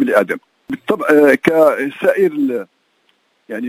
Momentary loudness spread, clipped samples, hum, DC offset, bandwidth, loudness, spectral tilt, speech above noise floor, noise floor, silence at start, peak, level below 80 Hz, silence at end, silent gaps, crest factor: 15 LU; under 0.1%; none; under 0.1%; 16 kHz; -14 LUFS; -6 dB/octave; 47 dB; -60 dBFS; 0 s; 0 dBFS; -62 dBFS; 0 s; none; 16 dB